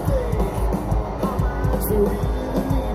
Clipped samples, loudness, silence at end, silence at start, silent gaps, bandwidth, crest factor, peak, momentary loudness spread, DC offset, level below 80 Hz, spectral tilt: under 0.1%; -23 LUFS; 0 s; 0 s; none; 16 kHz; 12 dB; -8 dBFS; 4 LU; under 0.1%; -26 dBFS; -7.5 dB/octave